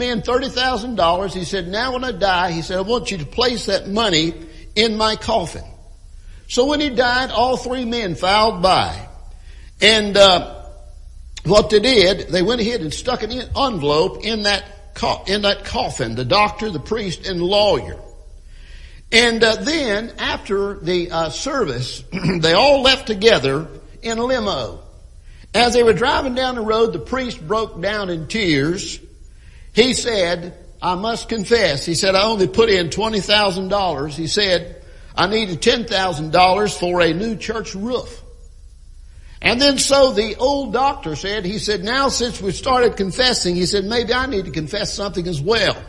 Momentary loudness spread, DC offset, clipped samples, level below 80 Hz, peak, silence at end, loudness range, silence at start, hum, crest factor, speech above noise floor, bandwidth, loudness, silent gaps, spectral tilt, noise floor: 11 LU; under 0.1%; under 0.1%; -38 dBFS; 0 dBFS; 0 s; 4 LU; 0 s; none; 18 dB; 23 dB; 11.5 kHz; -17 LUFS; none; -3.5 dB/octave; -40 dBFS